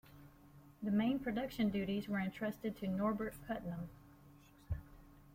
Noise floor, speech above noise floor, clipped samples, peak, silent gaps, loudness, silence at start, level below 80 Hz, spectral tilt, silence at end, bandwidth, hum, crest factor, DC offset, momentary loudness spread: -62 dBFS; 24 dB; under 0.1%; -24 dBFS; none; -40 LUFS; 0.05 s; -60 dBFS; -7.5 dB/octave; 0 s; 16.5 kHz; none; 16 dB; under 0.1%; 11 LU